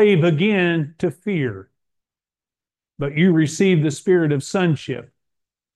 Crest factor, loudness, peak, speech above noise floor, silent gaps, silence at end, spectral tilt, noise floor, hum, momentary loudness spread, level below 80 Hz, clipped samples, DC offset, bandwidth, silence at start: 14 dB; -19 LUFS; -4 dBFS; over 72 dB; none; 0.75 s; -6.5 dB/octave; under -90 dBFS; none; 11 LU; -62 dBFS; under 0.1%; under 0.1%; 12 kHz; 0 s